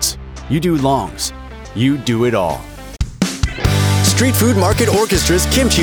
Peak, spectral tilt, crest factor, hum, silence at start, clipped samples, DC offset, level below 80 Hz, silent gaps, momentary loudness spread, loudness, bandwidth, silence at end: -2 dBFS; -4.5 dB/octave; 14 dB; none; 0 s; under 0.1%; under 0.1%; -26 dBFS; none; 13 LU; -15 LUFS; over 20 kHz; 0 s